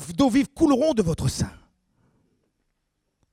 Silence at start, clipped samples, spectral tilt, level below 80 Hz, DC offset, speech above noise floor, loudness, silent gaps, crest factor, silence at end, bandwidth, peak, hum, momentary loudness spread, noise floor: 0 s; under 0.1%; -6 dB/octave; -46 dBFS; under 0.1%; 55 dB; -22 LUFS; none; 18 dB; 1.85 s; 15.5 kHz; -8 dBFS; none; 9 LU; -76 dBFS